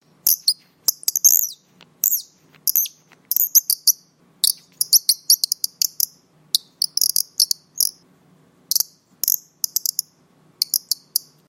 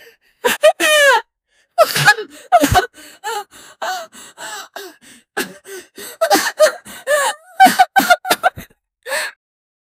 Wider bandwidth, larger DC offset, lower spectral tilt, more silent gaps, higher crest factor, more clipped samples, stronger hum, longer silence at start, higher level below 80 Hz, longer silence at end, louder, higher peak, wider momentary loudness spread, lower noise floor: about the same, 16.5 kHz vs 16.5 kHz; neither; second, 3.5 dB/octave vs -2.5 dB/octave; neither; first, 22 dB vs 16 dB; neither; neither; second, 0.25 s vs 0.45 s; second, -68 dBFS vs -42 dBFS; second, 0.3 s vs 0.7 s; second, -18 LUFS vs -15 LUFS; about the same, 0 dBFS vs 0 dBFS; second, 9 LU vs 19 LU; second, -56 dBFS vs -62 dBFS